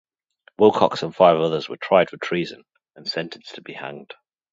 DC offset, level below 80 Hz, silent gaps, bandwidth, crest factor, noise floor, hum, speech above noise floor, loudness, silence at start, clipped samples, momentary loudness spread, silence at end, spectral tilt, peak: under 0.1%; -64 dBFS; none; 7.8 kHz; 22 dB; -58 dBFS; none; 38 dB; -20 LUFS; 0.6 s; under 0.1%; 18 LU; 0.5 s; -6 dB/octave; 0 dBFS